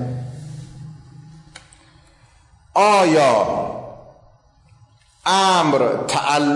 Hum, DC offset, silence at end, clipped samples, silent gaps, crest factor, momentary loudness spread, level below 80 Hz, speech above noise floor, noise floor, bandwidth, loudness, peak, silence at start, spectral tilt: none; under 0.1%; 0 s; under 0.1%; none; 14 dB; 23 LU; -54 dBFS; 37 dB; -53 dBFS; 11.5 kHz; -17 LUFS; -6 dBFS; 0 s; -4 dB/octave